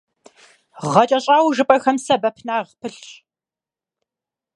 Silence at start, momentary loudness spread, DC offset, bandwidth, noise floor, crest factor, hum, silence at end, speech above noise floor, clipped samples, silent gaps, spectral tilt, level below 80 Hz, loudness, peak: 0.8 s; 17 LU; under 0.1%; 11.5 kHz; under -90 dBFS; 20 dB; none; 1.45 s; over 72 dB; under 0.1%; none; -4.5 dB/octave; -66 dBFS; -17 LUFS; 0 dBFS